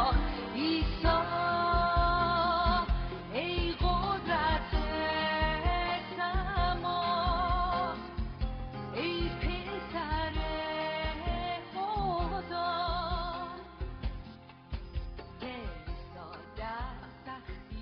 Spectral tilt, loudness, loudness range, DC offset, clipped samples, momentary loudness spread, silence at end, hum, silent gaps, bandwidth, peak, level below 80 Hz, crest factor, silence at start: -3.5 dB/octave; -32 LUFS; 13 LU; under 0.1%; under 0.1%; 16 LU; 0 s; none; none; 5.6 kHz; -14 dBFS; -38 dBFS; 18 dB; 0 s